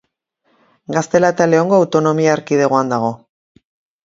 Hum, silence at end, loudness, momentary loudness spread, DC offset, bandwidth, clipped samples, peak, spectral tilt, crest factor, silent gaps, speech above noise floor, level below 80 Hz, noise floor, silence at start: none; 0.9 s; -15 LUFS; 9 LU; under 0.1%; 7.8 kHz; under 0.1%; 0 dBFS; -6 dB/octave; 16 dB; none; 51 dB; -60 dBFS; -65 dBFS; 0.9 s